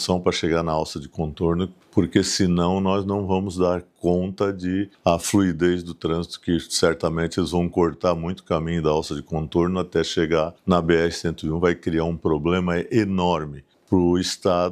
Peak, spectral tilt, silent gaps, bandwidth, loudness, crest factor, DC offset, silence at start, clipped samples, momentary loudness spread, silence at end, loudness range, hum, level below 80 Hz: -4 dBFS; -5.5 dB/octave; none; 14.5 kHz; -22 LUFS; 18 dB; under 0.1%; 0 s; under 0.1%; 6 LU; 0 s; 1 LU; none; -44 dBFS